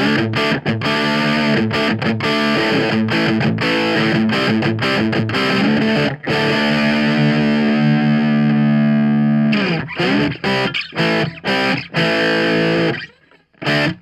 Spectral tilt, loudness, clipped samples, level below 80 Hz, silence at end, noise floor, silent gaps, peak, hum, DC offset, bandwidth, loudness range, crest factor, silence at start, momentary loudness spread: -6 dB/octave; -16 LUFS; under 0.1%; -50 dBFS; 0.05 s; -52 dBFS; none; -4 dBFS; none; under 0.1%; 12 kHz; 2 LU; 12 dB; 0 s; 3 LU